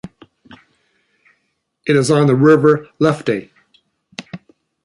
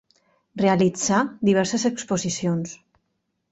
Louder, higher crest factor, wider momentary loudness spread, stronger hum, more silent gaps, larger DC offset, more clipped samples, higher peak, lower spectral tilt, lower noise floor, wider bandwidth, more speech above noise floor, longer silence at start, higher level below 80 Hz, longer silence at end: first, -14 LUFS vs -22 LUFS; about the same, 16 dB vs 18 dB; first, 25 LU vs 8 LU; neither; neither; neither; neither; first, 0 dBFS vs -6 dBFS; first, -6.5 dB/octave vs -5 dB/octave; second, -69 dBFS vs -75 dBFS; first, 11.5 kHz vs 8.2 kHz; about the same, 56 dB vs 53 dB; second, 0.05 s vs 0.55 s; about the same, -58 dBFS vs -60 dBFS; second, 0.5 s vs 0.75 s